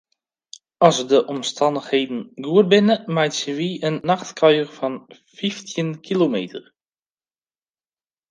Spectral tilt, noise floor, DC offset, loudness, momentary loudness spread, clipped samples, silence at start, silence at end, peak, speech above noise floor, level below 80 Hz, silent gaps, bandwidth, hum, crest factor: -5 dB/octave; under -90 dBFS; under 0.1%; -20 LUFS; 12 LU; under 0.1%; 0.8 s; 1.7 s; 0 dBFS; over 70 dB; -70 dBFS; none; 10 kHz; none; 20 dB